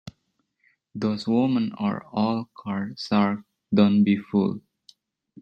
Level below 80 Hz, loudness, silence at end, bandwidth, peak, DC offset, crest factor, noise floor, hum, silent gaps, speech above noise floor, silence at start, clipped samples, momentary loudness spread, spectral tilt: -68 dBFS; -24 LUFS; 0.85 s; 6.8 kHz; -6 dBFS; under 0.1%; 20 dB; -74 dBFS; none; none; 51 dB; 0.05 s; under 0.1%; 11 LU; -8 dB/octave